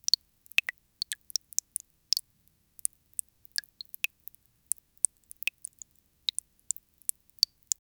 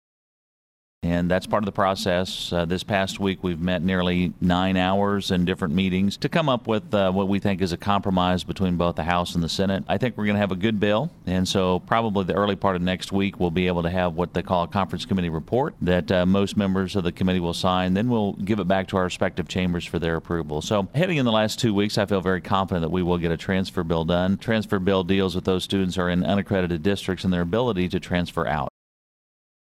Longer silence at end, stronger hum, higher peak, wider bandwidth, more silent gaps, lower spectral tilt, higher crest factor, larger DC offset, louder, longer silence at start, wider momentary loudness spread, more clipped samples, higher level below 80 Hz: first, 5.8 s vs 1 s; neither; first, 0 dBFS vs -6 dBFS; first, over 20 kHz vs 14 kHz; neither; second, 5 dB/octave vs -6 dB/octave; first, 36 dB vs 18 dB; neither; second, -32 LUFS vs -23 LUFS; about the same, 1.1 s vs 1 s; first, 11 LU vs 4 LU; neither; second, -76 dBFS vs -46 dBFS